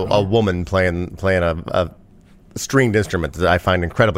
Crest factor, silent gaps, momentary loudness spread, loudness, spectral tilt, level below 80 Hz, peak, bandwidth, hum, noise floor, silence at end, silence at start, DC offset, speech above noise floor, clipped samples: 16 dB; none; 6 LU; -19 LUFS; -5.5 dB/octave; -38 dBFS; -2 dBFS; 16 kHz; none; -47 dBFS; 0 s; 0 s; under 0.1%; 29 dB; under 0.1%